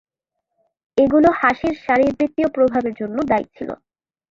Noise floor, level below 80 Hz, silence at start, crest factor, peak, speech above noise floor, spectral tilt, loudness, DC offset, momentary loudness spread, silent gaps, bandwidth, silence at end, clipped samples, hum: -80 dBFS; -50 dBFS; 0.95 s; 18 dB; -2 dBFS; 62 dB; -7 dB/octave; -18 LUFS; under 0.1%; 15 LU; none; 7.6 kHz; 0.55 s; under 0.1%; none